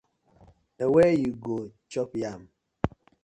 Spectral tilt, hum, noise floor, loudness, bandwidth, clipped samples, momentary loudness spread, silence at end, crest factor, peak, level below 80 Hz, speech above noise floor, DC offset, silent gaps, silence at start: -7.5 dB/octave; none; -58 dBFS; -27 LUFS; 10.5 kHz; under 0.1%; 15 LU; 0.35 s; 22 dB; -6 dBFS; -52 dBFS; 33 dB; under 0.1%; none; 0.8 s